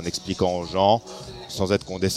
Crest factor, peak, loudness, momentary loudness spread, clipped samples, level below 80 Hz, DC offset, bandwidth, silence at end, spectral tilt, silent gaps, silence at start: 18 dB; -6 dBFS; -23 LUFS; 15 LU; under 0.1%; -48 dBFS; under 0.1%; 14.5 kHz; 0 s; -5 dB/octave; none; 0 s